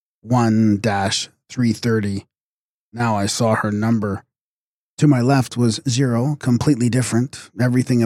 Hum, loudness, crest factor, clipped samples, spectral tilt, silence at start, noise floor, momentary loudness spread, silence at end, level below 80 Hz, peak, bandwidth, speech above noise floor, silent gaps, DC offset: none; -19 LUFS; 16 dB; under 0.1%; -6 dB/octave; 0.25 s; under -90 dBFS; 8 LU; 0 s; -54 dBFS; -4 dBFS; 14 kHz; over 72 dB; 2.41-2.92 s, 4.41-4.97 s; under 0.1%